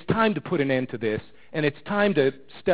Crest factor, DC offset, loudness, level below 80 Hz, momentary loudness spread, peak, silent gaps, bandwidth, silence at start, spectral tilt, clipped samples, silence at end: 18 dB; 0.5%; -25 LUFS; -54 dBFS; 8 LU; -8 dBFS; none; 4 kHz; 0.1 s; -10.5 dB/octave; under 0.1%; 0 s